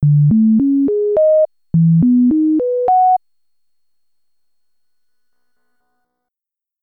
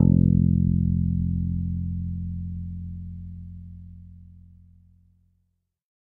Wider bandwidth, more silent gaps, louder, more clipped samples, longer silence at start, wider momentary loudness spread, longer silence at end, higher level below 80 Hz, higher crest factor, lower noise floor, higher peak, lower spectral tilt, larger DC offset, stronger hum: first, 2 kHz vs 1 kHz; neither; first, -13 LUFS vs -25 LUFS; neither; about the same, 0 s vs 0 s; second, 4 LU vs 23 LU; first, 3.65 s vs 1.6 s; second, -50 dBFS vs -38 dBFS; second, 8 dB vs 20 dB; first, -87 dBFS vs -74 dBFS; about the same, -6 dBFS vs -4 dBFS; about the same, -14.5 dB/octave vs -14.5 dB/octave; neither; neither